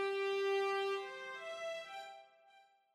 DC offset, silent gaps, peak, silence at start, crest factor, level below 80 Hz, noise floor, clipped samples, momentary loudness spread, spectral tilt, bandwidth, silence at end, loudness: under 0.1%; none; -28 dBFS; 0 s; 12 dB; under -90 dBFS; -67 dBFS; under 0.1%; 15 LU; -2 dB/octave; 12.5 kHz; 0.3 s; -39 LUFS